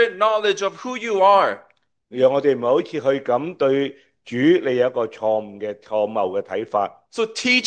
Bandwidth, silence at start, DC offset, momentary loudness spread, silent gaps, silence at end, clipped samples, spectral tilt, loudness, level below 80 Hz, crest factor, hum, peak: 9.4 kHz; 0 s; under 0.1%; 10 LU; none; 0 s; under 0.1%; -4.5 dB/octave; -20 LUFS; -72 dBFS; 16 dB; none; -4 dBFS